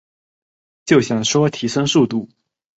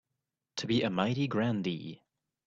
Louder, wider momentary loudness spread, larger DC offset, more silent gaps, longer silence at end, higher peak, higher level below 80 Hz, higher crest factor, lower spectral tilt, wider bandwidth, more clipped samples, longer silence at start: first, -17 LUFS vs -32 LUFS; second, 7 LU vs 12 LU; neither; neither; about the same, 0.55 s vs 0.5 s; first, -2 dBFS vs -14 dBFS; first, -58 dBFS vs -68 dBFS; about the same, 18 dB vs 20 dB; second, -4.5 dB/octave vs -6 dB/octave; about the same, 8.2 kHz vs 7.8 kHz; neither; first, 0.85 s vs 0.55 s